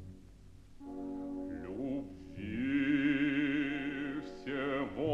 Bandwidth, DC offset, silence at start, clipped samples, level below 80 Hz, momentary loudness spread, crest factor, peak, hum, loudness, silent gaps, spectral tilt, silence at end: 7 kHz; under 0.1%; 0 s; under 0.1%; -60 dBFS; 15 LU; 16 dB; -20 dBFS; none; -36 LUFS; none; -7 dB/octave; 0 s